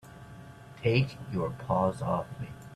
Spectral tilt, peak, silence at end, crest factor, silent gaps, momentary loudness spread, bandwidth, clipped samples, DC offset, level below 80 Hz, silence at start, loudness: -7.5 dB/octave; -12 dBFS; 0 s; 20 dB; none; 21 LU; 13 kHz; under 0.1%; under 0.1%; -56 dBFS; 0.05 s; -31 LUFS